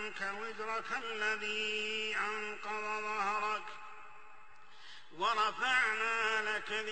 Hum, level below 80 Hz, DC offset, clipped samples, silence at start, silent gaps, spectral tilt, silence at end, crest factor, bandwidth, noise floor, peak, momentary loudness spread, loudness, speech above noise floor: none; -78 dBFS; 0.3%; under 0.1%; 0 s; none; -1 dB/octave; 0 s; 20 dB; 8.4 kHz; -59 dBFS; -16 dBFS; 19 LU; -34 LUFS; 23 dB